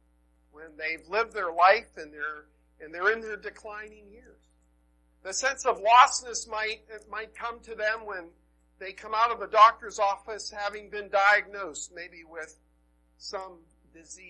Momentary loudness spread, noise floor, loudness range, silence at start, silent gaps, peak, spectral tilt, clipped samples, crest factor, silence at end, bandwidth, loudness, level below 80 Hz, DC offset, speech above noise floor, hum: 22 LU; -66 dBFS; 7 LU; 0.55 s; none; -6 dBFS; -0.5 dB/octave; under 0.1%; 22 dB; 0 s; 11.5 kHz; -26 LUFS; -62 dBFS; under 0.1%; 38 dB; none